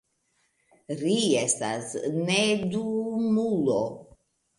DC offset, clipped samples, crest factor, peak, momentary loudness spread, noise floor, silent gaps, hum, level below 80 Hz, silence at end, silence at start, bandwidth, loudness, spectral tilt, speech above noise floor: under 0.1%; under 0.1%; 18 dB; -10 dBFS; 8 LU; -72 dBFS; none; none; -66 dBFS; 0.55 s; 0.9 s; 11.5 kHz; -26 LUFS; -4 dB/octave; 46 dB